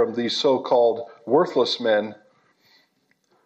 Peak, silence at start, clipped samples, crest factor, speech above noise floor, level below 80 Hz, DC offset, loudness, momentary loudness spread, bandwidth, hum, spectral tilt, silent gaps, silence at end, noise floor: -6 dBFS; 0 s; under 0.1%; 16 dB; 46 dB; -80 dBFS; under 0.1%; -21 LUFS; 4 LU; 8.4 kHz; none; -4.5 dB/octave; none; 1.3 s; -67 dBFS